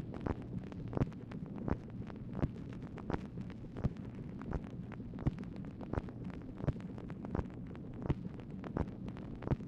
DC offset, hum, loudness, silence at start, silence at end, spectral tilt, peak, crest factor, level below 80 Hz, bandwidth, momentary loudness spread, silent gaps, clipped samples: under 0.1%; none; -43 LUFS; 0 s; 0 s; -9.5 dB/octave; -20 dBFS; 22 dB; -50 dBFS; 8 kHz; 6 LU; none; under 0.1%